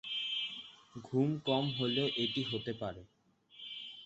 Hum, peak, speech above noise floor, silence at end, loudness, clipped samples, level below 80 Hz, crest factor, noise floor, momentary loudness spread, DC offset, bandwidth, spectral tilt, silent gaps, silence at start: none; -18 dBFS; 23 dB; 0 s; -35 LUFS; under 0.1%; -70 dBFS; 18 dB; -58 dBFS; 17 LU; under 0.1%; 8 kHz; -4 dB/octave; none; 0.05 s